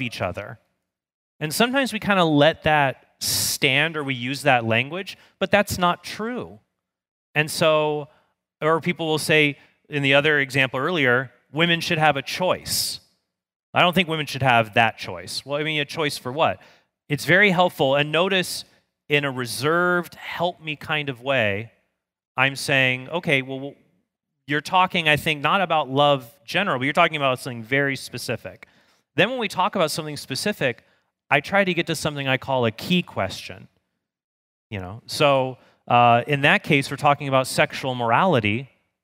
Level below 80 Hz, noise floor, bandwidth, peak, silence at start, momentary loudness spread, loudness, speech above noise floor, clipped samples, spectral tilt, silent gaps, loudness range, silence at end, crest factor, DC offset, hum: -58 dBFS; -76 dBFS; 16 kHz; -2 dBFS; 0 s; 12 LU; -21 LUFS; 54 dB; under 0.1%; -4 dB/octave; 1.14-1.39 s, 7.11-7.34 s, 13.56-13.73 s, 22.27-22.35 s, 34.24-34.70 s; 4 LU; 0.4 s; 22 dB; under 0.1%; none